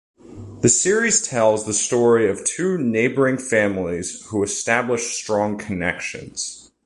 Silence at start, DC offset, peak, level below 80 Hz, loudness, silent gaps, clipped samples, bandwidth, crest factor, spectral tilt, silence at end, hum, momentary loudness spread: 0.25 s; under 0.1%; -4 dBFS; -50 dBFS; -20 LUFS; none; under 0.1%; 11.5 kHz; 18 dB; -3.5 dB/octave; 0.25 s; none; 12 LU